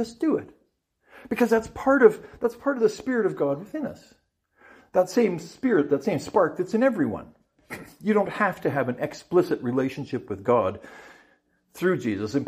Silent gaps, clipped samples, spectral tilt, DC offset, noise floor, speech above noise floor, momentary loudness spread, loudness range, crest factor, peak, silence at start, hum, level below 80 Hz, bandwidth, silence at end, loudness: none; under 0.1%; -6.5 dB/octave; under 0.1%; -69 dBFS; 45 dB; 11 LU; 3 LU; 22 dB; -4 dBFS; 0 s; none; -60 dBFS; 15.5 kHz; 0 s; -25 LUFS